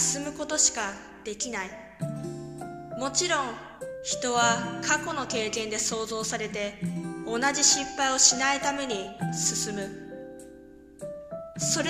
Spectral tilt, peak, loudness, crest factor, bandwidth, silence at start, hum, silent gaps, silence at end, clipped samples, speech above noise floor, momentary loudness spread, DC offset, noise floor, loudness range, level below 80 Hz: -2 dB/octave; -2 dBFS; -26 LUFS; 26 dB; 14 kHz; 0 s; none; none; 0 s; under 0.1%; 21 dB; 19 LU; under 0.1%; -49 dBFS; 7 LU; -58 dBFS